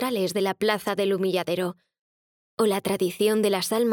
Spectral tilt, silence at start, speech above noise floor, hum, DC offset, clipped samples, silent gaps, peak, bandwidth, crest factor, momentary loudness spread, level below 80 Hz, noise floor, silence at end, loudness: -4.5 dB/octave; 0 s; over 66 dB; none; under 0.1%; under 0.1%; 2.01-2.57 s; -8 dBFS; over 20 kHz; 16 dB; 5 LU; -70 dBFS; under -90 dBFS; 0 s; -25 LUFS